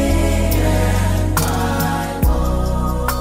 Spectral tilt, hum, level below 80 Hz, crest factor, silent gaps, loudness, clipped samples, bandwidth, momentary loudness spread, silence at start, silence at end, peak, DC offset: -5.5 dB/octave; none; -20 dBFS; 12 dB; none; -18 LUFS; under 0.1%; 16.5 kHz; 3 LU; 0 s; 0 s; -4 dBFS; under 0.1%